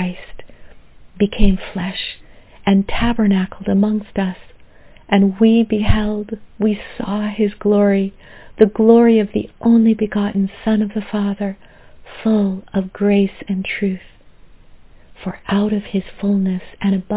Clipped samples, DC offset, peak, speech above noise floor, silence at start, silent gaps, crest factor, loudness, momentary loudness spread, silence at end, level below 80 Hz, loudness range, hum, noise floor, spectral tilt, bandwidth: under 0.1%; under 0.1%; 0 dBFS; 27 dB; 0 s; none; 18 dB; -17 LUFS; 12 LU; 0 s; -32 dBFS; 6 LU; none; -43 dBFS; -11.5 dB/octave; 4 kHz